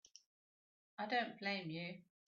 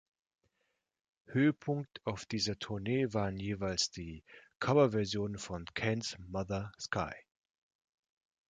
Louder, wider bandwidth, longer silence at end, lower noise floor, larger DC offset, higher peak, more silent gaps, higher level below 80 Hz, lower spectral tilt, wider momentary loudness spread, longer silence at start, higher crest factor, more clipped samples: second, -43 LUFS vs -35 LUFS; second, 7.2 kHz vs 9.4 kHz; second, 0.3 s vs 1.3 s; first, under -90 dBFS vs -82 dBFS; neither; second, -28 dBFS vs -14 dBFS; neither; second, -90 dBFS vs -60 dBFS; second, -2.5 dB/octave vs -5 dB/octave; about the same, 10 LU vs 10 LU; second, 1 s vs 1.3 s; about the same, 18 dB vs 22 dB; neither